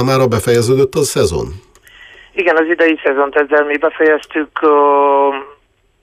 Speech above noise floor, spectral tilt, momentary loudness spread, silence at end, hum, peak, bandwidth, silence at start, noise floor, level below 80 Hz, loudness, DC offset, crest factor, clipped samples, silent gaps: 39 dB; -5 dB/octave; 7 LU; 0.55 s; none; -2 dBFS; 15.5 kHz; 0 s; -51 dBFS; -42 dBFS; -13 LUFS; under 0.1%; 12 dB; under 0.1%; none